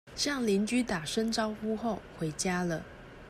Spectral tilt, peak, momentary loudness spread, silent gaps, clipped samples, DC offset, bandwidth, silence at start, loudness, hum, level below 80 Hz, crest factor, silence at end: -4 dB/octave; -18 dBFS; 8 LU; none; under 0.1%; under 0.1%; 15 kHz; 0.05 s; -32 LUFS; none; -56 dBFS; 14 dB; 0 s